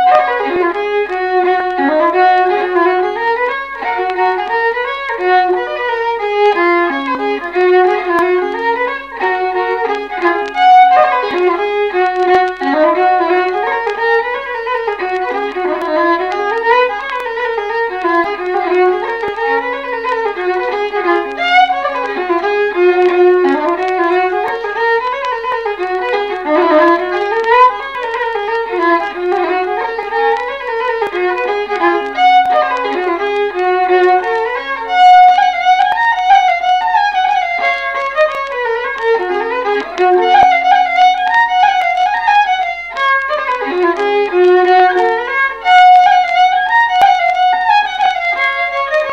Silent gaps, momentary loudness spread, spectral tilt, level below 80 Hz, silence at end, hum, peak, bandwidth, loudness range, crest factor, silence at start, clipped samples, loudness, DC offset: none; 8 LU; -3.5 dB/octave; -50 dBFS; 0 s; none; 0 dBFS; 7.8 kHz; 5 LU; 12 dB; 0 s; under 0.1%; -13 LUFS; 0.2%